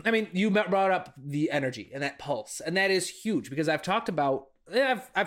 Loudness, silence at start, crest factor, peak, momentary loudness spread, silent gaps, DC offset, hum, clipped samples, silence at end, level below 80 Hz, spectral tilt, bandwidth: -28 LUFS; 0.05 s; 16 dB; -10 dBFS; 9 LU; none; under 0.1%; none; under 0.1%; 0 s; -68 dBFS; -4.5 dB/octave; 16.5 kHz